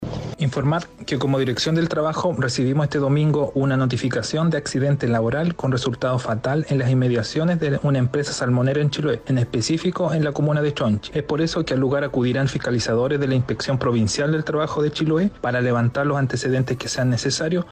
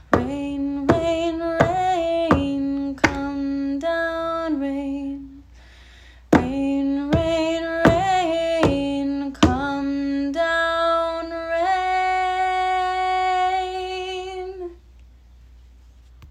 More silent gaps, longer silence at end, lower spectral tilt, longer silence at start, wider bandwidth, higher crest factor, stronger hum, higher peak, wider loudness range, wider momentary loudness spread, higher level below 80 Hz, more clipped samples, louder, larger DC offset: neither; about the same, 0 s vs 0 s; about the same, -6 dB/octave vs -6 dB/octave; about the same, 0 s vs 0.1 s; about the same, 9.8 kHz vs 10.5 kHz; second, 10 dB vs 22 dB; neither; second, -10 dBFS vs 0 dBFS; second, 1 LU vs 4 LU; second, 3 LU vs 8 LU; second, -48 dBFS vs -42 dBFS; neither; about the same, -21 LUFS vs -22 LUFS; neither